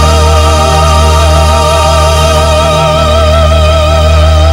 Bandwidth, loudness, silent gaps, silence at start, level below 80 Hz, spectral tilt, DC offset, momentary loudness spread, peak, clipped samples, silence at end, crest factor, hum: 14 kHz; -6 LUFS; none; 0 s; -10 dBFS; -5 dB/octave; under 0.1%; 1 LU; 0 dBFS; 0.9%; 0 s; 6 dB; none